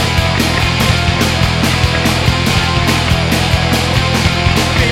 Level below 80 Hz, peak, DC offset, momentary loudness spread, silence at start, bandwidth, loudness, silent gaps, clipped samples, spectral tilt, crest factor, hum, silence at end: -22 dBFS; 0 dBFS; under 0.1%; 1 LU; 0 s; 16.5 kHz; -12 LUFS; none; under 0.1%; -4.5 dB/octave; 12 dB; none; 0 s